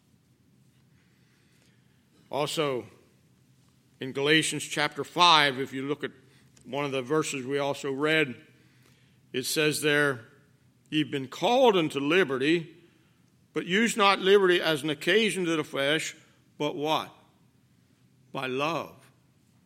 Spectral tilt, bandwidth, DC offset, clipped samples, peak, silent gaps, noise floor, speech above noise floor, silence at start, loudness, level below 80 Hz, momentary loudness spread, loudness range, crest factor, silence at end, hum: -3.5 dB/octave; 16.5 kHz; under 0.1%; under 0.1%; -4 dBFS; none; -64 dBFS; 38 dB; 2.3 s; -26 LUFS; -78 dBFS; 15 LU; 9 LU; 24 dB; 0.75 s; none